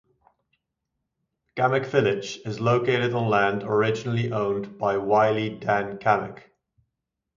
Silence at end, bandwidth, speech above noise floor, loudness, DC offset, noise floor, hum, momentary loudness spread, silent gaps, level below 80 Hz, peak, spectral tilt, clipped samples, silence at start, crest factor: 1 s; 7.6 kHz; 59 dB; -24 LUFS; under 0.1%; -83 dBFS; none; 6 LU; none; -62 dBFS; -6 dBFS; -6.5 dB/octave; under 0.1%; 1.55 s; 20 dB